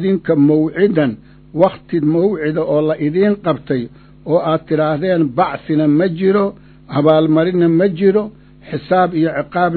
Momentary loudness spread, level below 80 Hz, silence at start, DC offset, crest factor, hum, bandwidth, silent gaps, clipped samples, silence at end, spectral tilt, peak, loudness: 9 LU; -48 dBFS; 0 s; under 0.1%; 14 dB; none; 4.5 kHz; none; under 0.1%; 0 s; -11.5 dB/octave; 0 dBFS; -15 LUFS